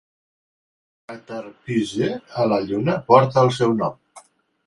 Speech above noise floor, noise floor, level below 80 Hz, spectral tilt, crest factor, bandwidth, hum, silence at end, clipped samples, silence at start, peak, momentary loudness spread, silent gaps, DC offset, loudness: 30 dB; -50 dBFS; -58 dBFS; -7 dB/octave; 22 dB; 11.5 kHz; none; 0.45 s; under 0.1%; 1.1 s; 0 dBFS; 18 LU; none; under 0.1%; -20 LUFS